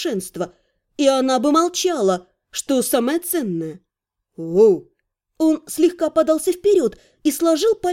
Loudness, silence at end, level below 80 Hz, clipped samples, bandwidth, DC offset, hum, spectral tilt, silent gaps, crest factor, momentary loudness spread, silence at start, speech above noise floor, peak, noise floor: -19 LUFS; 0 s; -60 dBFS; under 0.1%; 17 kHz; under 0.1%; none; -4 dB/octave; none; 16 dB; 13 LU; 0 s; 62 dB; -4 dBFS; -80 dBFS